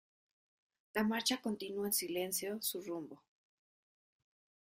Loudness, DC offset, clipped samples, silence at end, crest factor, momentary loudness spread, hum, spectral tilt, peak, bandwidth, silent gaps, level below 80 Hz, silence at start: -37 LUFS; under 0.1%; under 0.1%; 1.6 s; 22 dB; 10 LU; none; -2.5 dB/octave; -20 dBFS; 16 kHz; none; -80 dBFS; 0.95 s